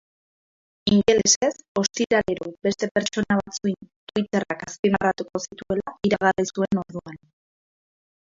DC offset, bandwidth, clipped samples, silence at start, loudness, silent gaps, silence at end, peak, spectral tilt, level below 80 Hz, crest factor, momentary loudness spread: under 0.1%; 7.8 kHz; under 0.1%; 0.85 s; -23 LUFS; 1.36-1.41 s, 1.68-1.75 s, 2.91-2.95 s, 3.96-4.07 s, 4.79-4.83 s; 1.2 s; -4 dBFS; -3.5 dB/octave; -54 dBFS; 20 dB; 12 LU